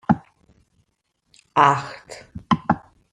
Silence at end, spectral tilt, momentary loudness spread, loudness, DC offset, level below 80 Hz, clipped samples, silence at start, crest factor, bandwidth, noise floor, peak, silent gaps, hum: 0.35 s; -6 dB/octave; 22 LU; -21 LUFS; under 0.1%; -54 dBFS; under 0.1%; 0.1 s; 22 dB; 10.5 kHz; -71 dBFS; -2 dBFS; none; none